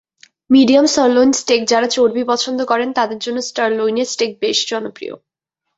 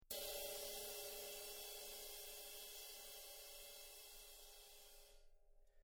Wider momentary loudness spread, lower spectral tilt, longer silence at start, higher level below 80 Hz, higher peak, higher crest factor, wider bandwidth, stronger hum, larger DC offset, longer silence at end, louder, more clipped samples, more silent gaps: second, 10 LU vs 13 LU; first, -2.5 dB/octave vs 0.5 dB/octave; first, 0.5 s vs 0 s; first, -58 dBFS vs -70 dBFS; first, -2 dBFS vs -32 dBFS; second, 14 dB vs 24 dB; second, 8 kHz vs over 20 kHz; neither; neither; first, 0.6 s vs 0 s; first, -15 LUFS vs -51 LUFS; neither; neither